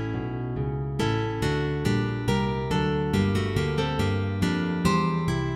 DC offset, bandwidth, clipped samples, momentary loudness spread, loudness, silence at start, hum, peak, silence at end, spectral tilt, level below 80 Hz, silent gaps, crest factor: under 0.1%; 16 kHz; under 0.1%; 5 LU; -26 LUFS; 0 s; none; -10 dBFS; 0 s; -6.5 dB/octave; -40 dBFS; none; 16 dB